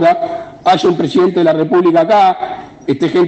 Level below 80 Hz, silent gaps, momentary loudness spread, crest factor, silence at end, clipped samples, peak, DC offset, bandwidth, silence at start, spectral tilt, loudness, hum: -54 dBFS; none; 11 LU; 12 dB; 0 s; under 0.1%; 0 dBFS; under 0.1%; 8.4 kHz; 0 s; -6.5 dB/octave; -12 LUFS; none